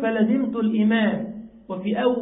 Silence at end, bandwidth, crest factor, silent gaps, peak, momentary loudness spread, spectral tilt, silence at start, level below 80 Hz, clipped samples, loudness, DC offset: 0 s; 4 kHz; 14 dB; none; -8 dBFS; 15 LU; -11.5 dB/octave; 0 s; -60 dBFS; under 0.1%; -22 LUFS; under 0.1%